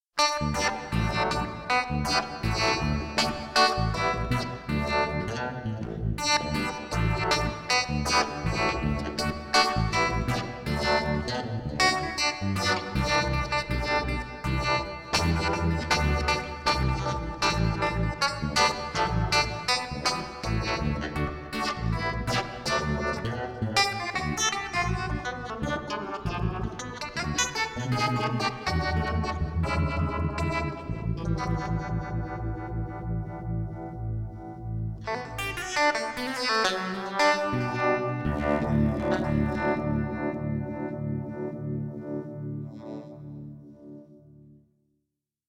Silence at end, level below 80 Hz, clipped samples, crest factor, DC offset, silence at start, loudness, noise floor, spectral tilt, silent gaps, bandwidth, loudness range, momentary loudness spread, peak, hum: 0.95 s; -38 dBFS; under 0.1%; 20 dB; under 0.1%; 0.15 s; -28 LUFS; -82 dBFS; -4.5 dB/octave; none; 16.5 kHz; 6 LU; 9 LU; -10 dBFS; none